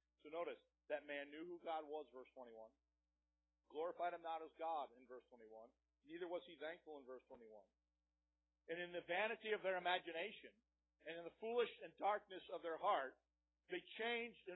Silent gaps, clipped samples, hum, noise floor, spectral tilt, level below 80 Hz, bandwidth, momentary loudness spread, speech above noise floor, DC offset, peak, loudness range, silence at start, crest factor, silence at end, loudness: none; under 0.1%; none; under -90 dBFS; 2 dB/octave; -90 dBFS; 3.9 kHz; 19 LU; over 42 dB; under 0.1%; -26 dBFS; 9 LU; 0.25 s; 22 dB; 0 s; -48 LUFS